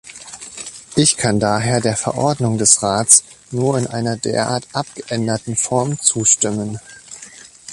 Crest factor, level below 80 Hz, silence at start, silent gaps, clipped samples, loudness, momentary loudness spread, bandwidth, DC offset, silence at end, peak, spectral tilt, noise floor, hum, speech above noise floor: 18 dB; -50 dBFS; 0.05 s; none; under 0.1%; -16 LUFS; 21 LU; 16 kHz; under 0.1%; 0 s; 0 dBFS; -3.5 dB/octave; -40 dBFS; none; 23 dB